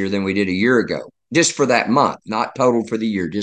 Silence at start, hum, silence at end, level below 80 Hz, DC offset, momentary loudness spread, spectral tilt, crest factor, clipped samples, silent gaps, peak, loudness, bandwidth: 0 s; none; 0 s; -52 dBFS; under 0.1%; 8 LU; -4 dB/octave; 18 dB; under 0.1%; none; 0 dBFS; -18 LUFS; 10 kHz